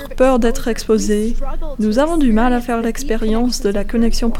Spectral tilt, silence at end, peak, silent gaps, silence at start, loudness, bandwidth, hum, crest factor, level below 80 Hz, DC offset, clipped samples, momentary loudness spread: -5 dB/octave; 0 s; 0 dBFS; none; 0 s; -17 LUFS; 14.5 kHz; none; 14 dB; -20 dBFS; under 0.1%; under 0.1%; 7 LU